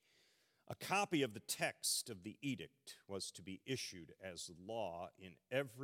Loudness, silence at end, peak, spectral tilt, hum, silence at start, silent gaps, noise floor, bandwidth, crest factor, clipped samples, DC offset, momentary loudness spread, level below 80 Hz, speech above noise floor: -43 LUFS; 0 s; -24 dBFS; -3 dB/octave; none; 0.7 s; none; -76 dBFS; 16.5 kHz; 22 dB; under 0.1%; under 0.1%; 15 LU; -86 dBFS; 32 dB